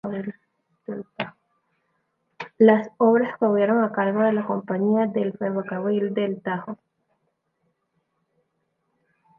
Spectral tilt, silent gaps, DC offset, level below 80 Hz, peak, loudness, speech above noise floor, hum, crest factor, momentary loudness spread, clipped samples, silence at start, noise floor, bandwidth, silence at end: -9 dB/octave; none; under 0.1%; -74 dBFS; -4 dBFS; -22 LUFS; 52 dB; none; 20 dB; 18 LU; under 0.1%; 0.05 s; -74 dBFS; 4.8 kHz; 2.65 s